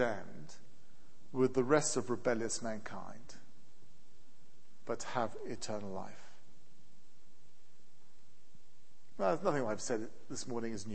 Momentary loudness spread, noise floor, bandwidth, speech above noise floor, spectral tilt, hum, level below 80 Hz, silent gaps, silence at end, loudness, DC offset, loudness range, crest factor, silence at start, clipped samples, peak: 23 LU; -70 dBFS; 8.4 kHz; 33 dB; -4.5 dB/octave; none; -70 dBFS; none; 0 s; -37 LUFS; 1%; 11 LU; 26 dB; 0 s; under 0.1%; -14 dBFS